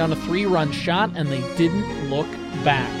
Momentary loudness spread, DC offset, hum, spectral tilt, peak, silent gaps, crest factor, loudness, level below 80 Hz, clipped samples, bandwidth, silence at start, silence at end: 5 LU; under 0.1%; none; -6 dB/octave; -4 dBFS; none; 18 dB; -22 LUFS; -46 dBFS; under 0.1%; 13.5 kHz; 0 s; 0 s